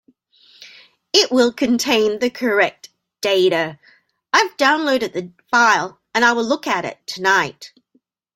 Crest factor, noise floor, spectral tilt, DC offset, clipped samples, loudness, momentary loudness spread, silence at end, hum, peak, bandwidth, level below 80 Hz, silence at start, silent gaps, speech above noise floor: 18 dB; -63 dBFS; -2.5 dB/octave; under 0.1%; under 0.1%; -17 LUFS; 8 LU; 0.7 s; none; 0 dBFS; 16.5 kHz; -64 dBFS; 0.6 s; none; 46 dB